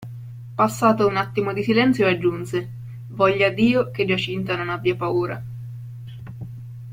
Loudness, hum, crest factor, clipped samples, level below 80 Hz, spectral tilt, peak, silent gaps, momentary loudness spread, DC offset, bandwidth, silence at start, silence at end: -21 LUFS; none; 18 dB; under 0.1%; -56 dBFS; -6.5 dB/octave; -4 dBFS; none; 18 LU; under 0.1%; 16.5 kHz; 0 s; 0 s